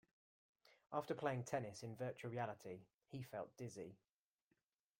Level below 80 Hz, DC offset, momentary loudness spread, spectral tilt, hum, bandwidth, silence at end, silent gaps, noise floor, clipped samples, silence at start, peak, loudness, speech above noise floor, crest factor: -84 dBFS; under 0.1%; 12 LU; -6 dB/octave; none; 16.5 kHz; 1.05 s; 2.94-2.98 s; -88 dBFS; under 0.1%; 0.65 s; -28 dBFS; -49 LUFS; 40 dB; 22 dB